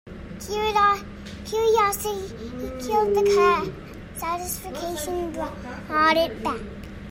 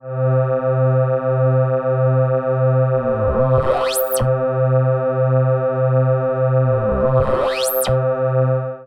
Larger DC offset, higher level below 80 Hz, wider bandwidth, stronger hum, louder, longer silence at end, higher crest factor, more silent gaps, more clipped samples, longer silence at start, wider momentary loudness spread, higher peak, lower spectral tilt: neither; second, -44 dBFS vs -38 dBFS; about the same, 16.5 kHz vs 17.5 kHz; neither; second, -24 LUFS vs -17 LUFS; about the same, 0 s vs 0 s; about the same, 16 dB vs 14 dB; neither; neither; about the same, 0.05 s vs 0.05 s; first, 18 LU vs 2 LU; second, -8 dBFS vs -2 dBFS; second, -4 dB/octave vs -6.5 dB/octave